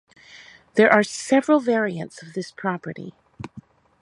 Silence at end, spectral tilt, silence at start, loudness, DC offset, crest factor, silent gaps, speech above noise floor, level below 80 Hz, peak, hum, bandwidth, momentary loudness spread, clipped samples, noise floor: 0.4 s; -5 dB/octave; 0.35 s; -21 LUFS; under 0.1%; 22 dB; none; 27 dB; -64 dBFS; 0 dBFS; none; 11.5 kHz; 23 LU; under 0.1%; -48 dBFS